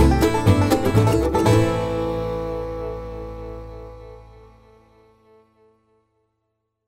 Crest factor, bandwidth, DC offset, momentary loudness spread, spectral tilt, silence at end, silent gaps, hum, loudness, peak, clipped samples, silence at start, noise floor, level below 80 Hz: 18 dB; 16 kHz; under 0.1%; 21 LU; -7 dB/octave; 2.65 s; none; none; -20 LUFS; -2 dBFS; under 0.1%; 0 s; -75 dBFS; -32 dBFS